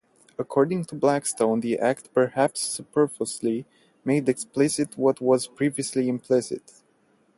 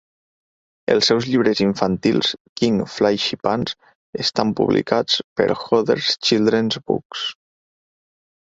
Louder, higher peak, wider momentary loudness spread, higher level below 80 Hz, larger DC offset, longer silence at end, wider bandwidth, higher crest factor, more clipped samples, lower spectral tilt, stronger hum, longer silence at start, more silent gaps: second, -25 LUFS vs -19 LUFS; second, -6 dBFS vs -2 dBFS; about the same, 6 LU vs 8 LU; second, -68 dBFS vs -54 dBFS; neither; second, 0.8 s vs 1.15 s; first, 12 kHz vs 8 kHz; about the same, 18 dB vs 18 dB; neither; about the same, -5 dB/octave vs -5 dB/octave; neither; second, 0.4 s vs 0.9 s; second, none vs 2.40-2.56 s, 3.95-4.13 s, 5.24-5.36 s, 7.05-7.10 s